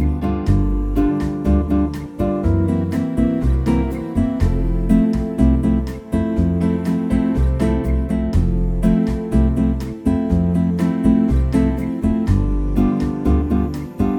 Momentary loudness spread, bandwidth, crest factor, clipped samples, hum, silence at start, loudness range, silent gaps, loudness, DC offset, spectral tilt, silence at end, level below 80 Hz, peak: 4 LU; 12 kHz; 14 dB; under 0.1%; none; 0 s; 1 LU; none; -19 LUFS; under 0.1%; -9 dB/octave; 0 s; -22 dBFS; -2 dBFS